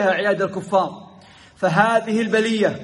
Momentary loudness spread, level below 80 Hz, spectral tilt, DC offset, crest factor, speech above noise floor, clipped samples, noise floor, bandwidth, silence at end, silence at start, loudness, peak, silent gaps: 6 LU; -62 dBFS; -5.5 dB/octave; under 0.1%; 18 dB; 28 dB; under 0.1%; -46 dBFS; 11.5 kHz; 0 s; 0 s; -20 LUFS; -2 dBFS; none